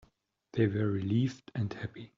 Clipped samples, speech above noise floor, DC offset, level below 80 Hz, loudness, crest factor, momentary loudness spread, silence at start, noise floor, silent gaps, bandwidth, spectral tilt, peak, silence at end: under 0.1%; 37 dB; under 0.1%; -66 dBFS; -33 LUFS; 18 dB; 9 LU; 0.55 s; -69 dBFS; none; 7.4 kHz; -8 dB/octave; -16 dBFS; 0.1 s